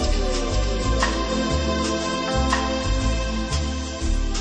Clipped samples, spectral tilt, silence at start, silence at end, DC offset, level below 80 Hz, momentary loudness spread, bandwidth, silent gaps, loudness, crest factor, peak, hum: under 0.1%; -4.5 dB/octave; 0 s; 0 s; under 0.1%; -26 dBFS; 4 LU; 10 kHz; none; -24 LUFS; 14 dB; -8 dBFS; none